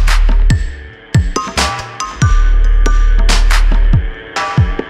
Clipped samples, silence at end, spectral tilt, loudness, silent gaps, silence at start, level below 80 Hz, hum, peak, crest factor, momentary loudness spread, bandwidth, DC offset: under 0.1%; 0 s; -4.5 dB/octave; -15 LUFS; none; 0 s; -12 dBFS; none; 0 dBFS; 10 dB; 7 LU; 11.5 kHz; under 0.1%